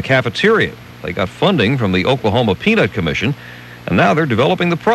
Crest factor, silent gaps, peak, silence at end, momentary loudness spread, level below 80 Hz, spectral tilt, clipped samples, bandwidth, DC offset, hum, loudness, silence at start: 14 dB; none; -2 dBFS; 0 s; 10 LU; -44 dBFS; -6.5 dB/octave; under 0.1%; 12.5 kHz; under 0.1%; 60 Hz at -40 dBFS; -15 LUFS; 0 s